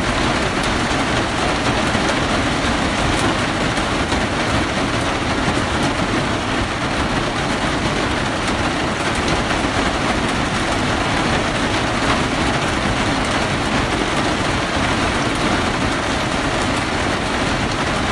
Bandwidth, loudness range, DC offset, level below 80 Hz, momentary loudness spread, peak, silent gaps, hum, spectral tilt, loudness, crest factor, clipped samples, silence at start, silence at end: 11.5 kHz; 1 LU; under 0.1%; -30 dBFS; 2 LU; -2 dBFS; none; none; -4 dB/octave; -18 LUFS; 16 dB; under 0.1%; 0 s; 0 s